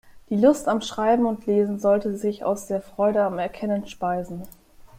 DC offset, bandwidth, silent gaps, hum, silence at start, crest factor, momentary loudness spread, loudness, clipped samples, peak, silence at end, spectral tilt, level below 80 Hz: under 0.1%; 16 kHz; none; none; 0.15 s; 18 dB; 9 LU; -23 LUFS; under 0.1%; -6 dBFS; 0.1 s; -6 dB/octave; -54 dBFS